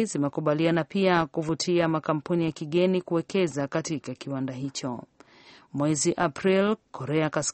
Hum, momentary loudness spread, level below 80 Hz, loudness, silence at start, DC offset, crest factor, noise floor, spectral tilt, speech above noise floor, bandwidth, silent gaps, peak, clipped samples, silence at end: none; 9 LU; -62 dBFS; -26 LUFS; 0 s; under 0.1%; 18 dB; -54 dBFS; -5 dB/octave; 28 dB; 8.8 kHz; none; -8 dBFS; under 0.1%; 0 s